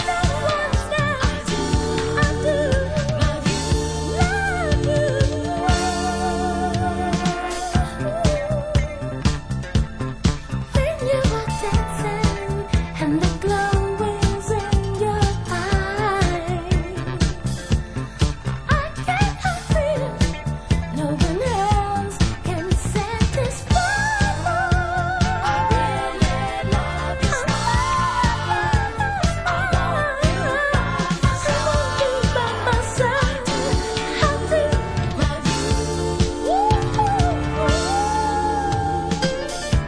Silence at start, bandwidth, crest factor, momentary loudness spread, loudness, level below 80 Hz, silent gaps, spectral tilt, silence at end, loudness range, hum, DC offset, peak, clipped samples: 0 s; 11 kHz; 18 dB; 4 LU; -21 LUFS; -28 dBFS; none; -5.5 dB/octave; 0 s; 2 LU; none; under 0.1%; -2 dBFS; under 0.1%